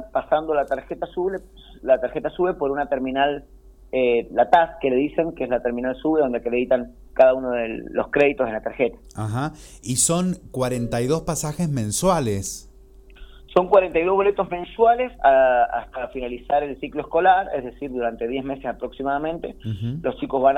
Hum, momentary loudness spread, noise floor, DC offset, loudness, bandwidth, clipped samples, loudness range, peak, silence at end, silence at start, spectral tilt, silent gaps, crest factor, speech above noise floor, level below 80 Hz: none; 12 LU; -47 dBFS; under 0.1%; -22 LUFS; 18 kHz; under 0.1%; 4 LU; -2 dBFS; 0 s; 0 s; -5 dB/octave; none; 20 dB; 25 dB; -46 dBFS